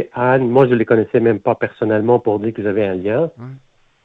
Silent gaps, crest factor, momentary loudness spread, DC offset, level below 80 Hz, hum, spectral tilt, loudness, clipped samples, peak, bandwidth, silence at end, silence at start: none; 16 dB; 7 LU; under 0.1%; -56 dBFS; none; -10 dB/octave; -16 LUFS; under 0.1%; 0 dBFS; 4.5 kHz; 0.45 s; 0 s